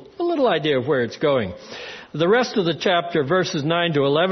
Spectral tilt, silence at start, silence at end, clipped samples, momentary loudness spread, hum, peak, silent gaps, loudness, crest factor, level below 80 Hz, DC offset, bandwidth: -5.5 dB/octave; 0 s; 0 s; under 0.1%; 12 LU; none; -6 dBFS; none; -20 LUFS; 16 dB; -60 dBFS; under 0.1%; 6.4 kHz